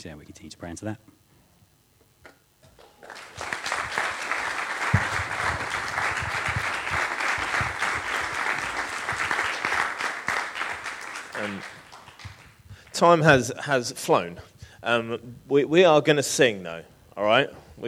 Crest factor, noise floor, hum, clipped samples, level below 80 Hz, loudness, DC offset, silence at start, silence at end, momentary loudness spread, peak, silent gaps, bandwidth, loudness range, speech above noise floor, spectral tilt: 26 dB; -61 dBFS; none; under 0.1%; -52 dBFS; -24 LUFS; under 0.1%; 0 s; 0 s; 21 LU; -2 dBFS; none; 16.5 kHz; 10 LU; 38 dB; -4 dB/octave